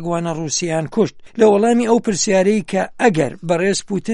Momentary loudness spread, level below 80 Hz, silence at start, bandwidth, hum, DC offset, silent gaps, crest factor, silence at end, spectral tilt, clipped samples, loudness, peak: 7 LU; -52 dBFS; 0 s; 11.5 kHz; none; under 0.1%; none; 16 dB; 0 s; -4.5 dB/octave; under 0.1%; -17 LUFS; -2 dBFS